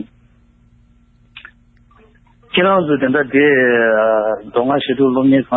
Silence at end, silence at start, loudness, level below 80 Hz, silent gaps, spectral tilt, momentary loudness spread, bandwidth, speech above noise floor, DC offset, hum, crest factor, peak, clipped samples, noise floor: 0 s; 0 s; -14 LUFS; -52 dBFS; none; -9.5 dB/octave; 7 LU; 4 kHz; 38 dB; under 0.1%; none; 14 dB; -2 dBFS; under 0.1%; -51 dBFS